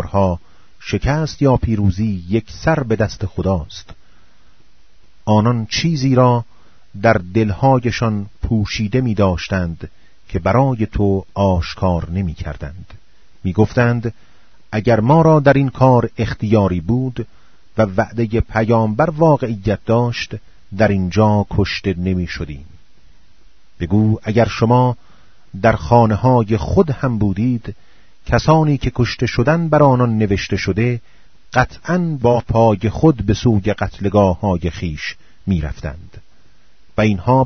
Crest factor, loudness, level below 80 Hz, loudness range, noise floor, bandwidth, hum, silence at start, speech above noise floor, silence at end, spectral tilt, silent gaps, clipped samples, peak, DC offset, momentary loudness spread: 16 dB; -16 LUFS; -34 dBFS; 5 LU; -54 dBFS; 6.6 kHz; none; 0 s; 38 dB; 0 s; -7.5 dB/octave; none; under 0.1%; 0 dBFS; 1%; 14 LU